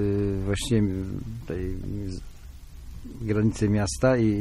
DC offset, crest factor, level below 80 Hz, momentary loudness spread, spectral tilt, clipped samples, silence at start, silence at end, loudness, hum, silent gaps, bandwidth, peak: under 0.1%; 16 dB; -38 dBFS; 22 LU; -6.5 dB/octave; under 0.1%; 0 s; 0 s; -27 LUFS; none; none; 14 kHz; -10 dBFS